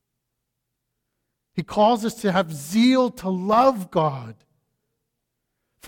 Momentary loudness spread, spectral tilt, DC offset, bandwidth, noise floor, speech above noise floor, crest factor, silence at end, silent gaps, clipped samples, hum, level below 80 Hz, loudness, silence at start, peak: 10 LU; -6 dB/octave; under 0.1%; 17.5 kHz; -79 dBFS; 59 dB; 18 dB; 0 s; none; under 0.1%; none; -60 dBFS; -21 LUFS; 1.55 s; -6 dBFS